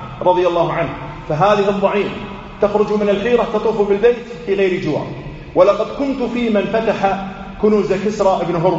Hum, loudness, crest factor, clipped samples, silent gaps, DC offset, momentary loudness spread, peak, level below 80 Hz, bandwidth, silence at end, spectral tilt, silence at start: none; -16 LUFS; 16 dB; under 0.1%; none; under 0.1%; 10 LU; 0 dBFS; -40 dBFS; 8 kHz; 0 s; -5 dB/octave; 0 s